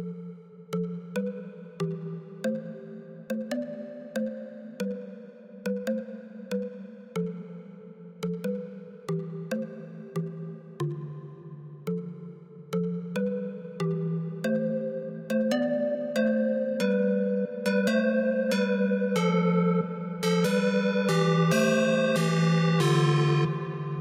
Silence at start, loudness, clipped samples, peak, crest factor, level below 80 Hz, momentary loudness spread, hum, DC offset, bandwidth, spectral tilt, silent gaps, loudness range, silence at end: 0 s; -28 LUFS; under 0.1%; -12 dBFS; 18 dB; -74 dBFS; 19 LU; none; under 0.1%; 16 kHz; -6.5 dB/octave; none; 12 LU; 0 s